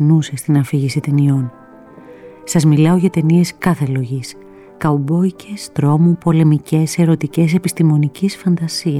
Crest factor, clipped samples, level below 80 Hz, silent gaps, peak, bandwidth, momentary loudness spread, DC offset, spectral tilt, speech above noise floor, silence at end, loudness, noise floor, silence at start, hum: 12 dB; under 0.1%; -50 dBFS; none; -2 dBFS; 14 kHz; 8 LU; under 0.1%; -7 dB/octave; 25 dB; 0 s; -15 LUFS; -39 dBFS; 0 s; none